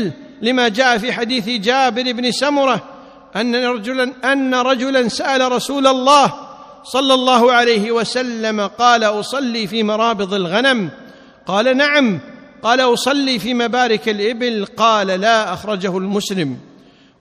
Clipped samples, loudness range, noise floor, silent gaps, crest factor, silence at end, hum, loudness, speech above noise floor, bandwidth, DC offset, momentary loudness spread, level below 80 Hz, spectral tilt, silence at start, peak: under 0.1%; 3 LU; -46 dBFS; none; 16 dB; 0.6 s; none; -16 LUFS; 31 dB; 14.5 kHz; under 0.1%; 8 LU; -58 dBFS; -4 dB/octave; 0 s; 0 dBFS